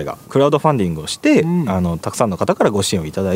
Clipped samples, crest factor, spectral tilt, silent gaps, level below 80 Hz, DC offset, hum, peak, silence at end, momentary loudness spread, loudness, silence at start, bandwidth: under 0.1%; 16 dB; -5.5 dB/octave; none; -44 dBFS; under 0.1%; none; 0 dBFS; 0 s; 6 LU; -17 LUFS; 0 s; 16 kHz